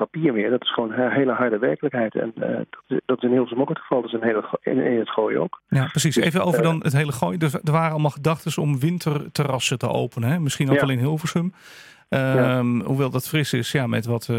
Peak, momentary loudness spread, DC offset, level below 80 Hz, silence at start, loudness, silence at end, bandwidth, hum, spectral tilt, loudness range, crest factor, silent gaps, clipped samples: -6 dBFS; 6 LU; under 0.1%; -62 dBFS; 0 s; -22 LUFS; 0 s; 16.5 kHz; none; -6 dB/octave; 2 LU; 16 dB; none; under 0.1%